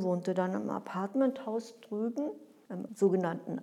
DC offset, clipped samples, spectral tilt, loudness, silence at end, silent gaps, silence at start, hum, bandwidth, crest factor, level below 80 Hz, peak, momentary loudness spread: under 0.1%; under 0.1%; -7.5 dB/octave; -33 LUFS; 0 s; none; 0 s; none; 12.5 kHz; 18 dB; under -90 dBFS; -16 dBFS; 13 LU